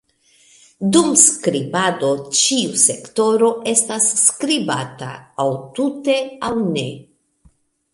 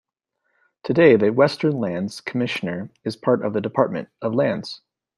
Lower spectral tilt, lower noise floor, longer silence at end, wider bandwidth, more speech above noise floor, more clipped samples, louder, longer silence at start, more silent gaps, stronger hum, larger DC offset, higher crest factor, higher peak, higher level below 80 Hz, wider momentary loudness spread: second, -2.5 dB/octave vs -7 dB/octave; second, -56 dBFS vs -74 dBFS; first, 0.9 s vs 0.4 s; first, 13.5 kHz vs 12 kHz; second, 38 dB vs 54 dB; neither; first, -16 LUFS vs -21 LUFS; about the same, 0.8 s vs 0.85 s; neither; neither; neither; about the same, 18 dB vs 20 dB; about the same, 0 dBFS vs -2 dBFS; about the same, -60 dBFS vs -64 dBFS; second, 11 LU vs 14 LU